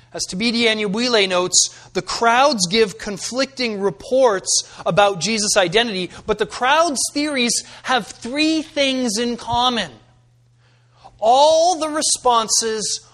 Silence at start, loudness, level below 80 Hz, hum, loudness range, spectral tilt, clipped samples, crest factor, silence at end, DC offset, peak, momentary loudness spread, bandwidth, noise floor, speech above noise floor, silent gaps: 0.15 s; -18 LUFS; -52 dBFS; none; 3 LU; -2 dB/octave; under 0.1%; 18 dB; 0.15 s; under 0.1%; 0 dBFS; 8 LU; 13.5 kHz; -55 dBFS; 36 dB; none